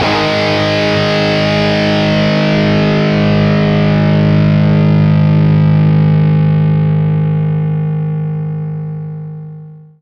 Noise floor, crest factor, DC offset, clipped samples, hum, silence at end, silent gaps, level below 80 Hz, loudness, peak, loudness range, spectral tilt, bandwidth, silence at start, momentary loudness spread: -32 dBFS; 12 dB; under 0.1%; under 0.1%; none; 0.2 s; none; -36 dBFS; -11 LUFS; 0 dBFS; 4 LU; -7.5 dB/octave; 6.6 kHz; 0 s; 10 LU